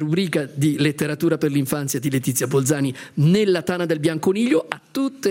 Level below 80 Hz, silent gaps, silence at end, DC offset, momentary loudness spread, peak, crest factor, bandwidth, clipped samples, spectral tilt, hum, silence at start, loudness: -62 dBFS; none; 0 s; under 0.1%; 5 LU; 0 dBFS; 20 dB; 17 kHz; under 0.1%; -5.5 dB/octave; none; 0 s; -21 LUFS